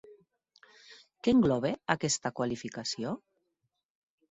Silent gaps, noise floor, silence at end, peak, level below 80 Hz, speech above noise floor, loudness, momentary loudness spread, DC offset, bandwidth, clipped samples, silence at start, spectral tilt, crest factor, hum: none; -82 dBFS; 1.15 s; -10 dBFS; -64 dBFS; 52 dB; -30 LUFS; 11 LU; under 0.1%; 8.4 kHz; under 0.1%; 0.1 s; -4.5 dB/octave; 24 dB; none